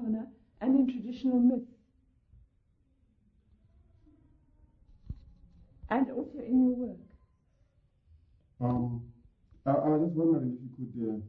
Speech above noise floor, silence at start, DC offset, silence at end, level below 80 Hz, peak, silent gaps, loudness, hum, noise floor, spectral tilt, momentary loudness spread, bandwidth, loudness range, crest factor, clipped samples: 41 dB; 0 s; under 0.1%; 0 s; -58 dBFS; -14 dBFS; none; -30 LUFS; none; -70 dBFS; -11 dB/octave; 21 LU; 4.7 kHz; 6 LU; 18 dB; under 0.1%